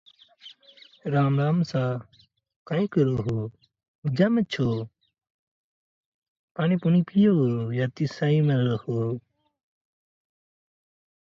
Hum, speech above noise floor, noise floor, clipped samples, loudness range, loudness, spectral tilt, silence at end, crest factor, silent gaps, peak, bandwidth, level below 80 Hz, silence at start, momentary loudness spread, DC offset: none; 31 dB; -54 dBFS; under 0.1%; 5 LU; -25 LUFS; -8.5 dB/octave; 2.15 s; 18 dB; 2.56-2.65 s, 3.88-4.02 s, 5.30-6.22 s, 6.28-6.55 s; -8 dBFS; 7.2 kHz; -60 dBFS; 0.45 s; 12 LU; under 0.1%